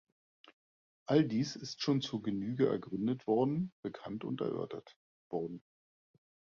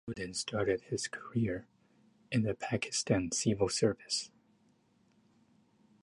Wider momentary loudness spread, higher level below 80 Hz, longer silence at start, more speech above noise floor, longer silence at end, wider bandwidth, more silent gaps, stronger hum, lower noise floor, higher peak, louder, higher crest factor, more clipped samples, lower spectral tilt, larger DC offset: first, 13 LU vs 7 LU; second, -72 dBFS vs -60 dBFS; first, 0.45 s vs 0.05 s; first, over 55 dB vs 36 dB; second, 0.9 s vs 1.75 s; second, 7.4 kHz vs 11.5 kHz; first, 0.53-1.06 s, 3.72-3.83 s, 4.96-5.31 s vs none; neither; first, under -90 dBFS vs -70 dBFS; about the same, -16 dBFS vs -14 dBFS; about the same, -35 LUFS vs -34 LUFS; about the same, 22 dB vs 20 dB; neither; first, -6.5 dB/octave vs -4.5 dB/octave; neither